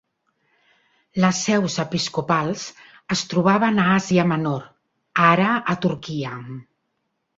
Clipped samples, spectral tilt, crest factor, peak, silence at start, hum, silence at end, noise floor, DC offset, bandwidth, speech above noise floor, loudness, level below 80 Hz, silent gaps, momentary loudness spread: under 0.1%; -5 dB/octave; 20 dB; -2 dBFS; 1.15 s; none; 0.75 s; -74 dBFS; under 0.1%; 7.8 kHz; 54 dB; -21 LUFS; -58 dBFS; none; 14 LU